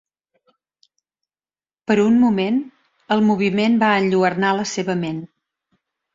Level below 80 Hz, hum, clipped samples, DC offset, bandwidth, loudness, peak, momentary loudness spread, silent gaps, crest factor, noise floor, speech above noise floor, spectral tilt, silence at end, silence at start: -62 dBFS; none; under 0.1%; under 0.1%; 7.6 kHz; -18 LUFS; -2 dBFS; 10 LU; none; 18 dB; under -90 dBFS; over 73 dB; -6 dB/octave; 0.9 s; 1.9 s